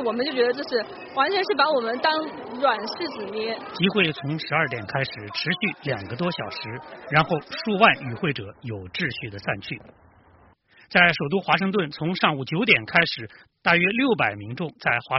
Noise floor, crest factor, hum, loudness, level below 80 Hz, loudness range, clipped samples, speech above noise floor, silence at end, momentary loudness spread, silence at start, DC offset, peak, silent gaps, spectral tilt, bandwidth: -56 dBFS; 22 dB; none; -23 LUFS; -60 dBFS; 4 LU; under 0.1%; 32 dB; 0 s; 13 LU; 0 s; under 0.1%; -2 dBFS; none; -2.5 dB/octave; 6 kHz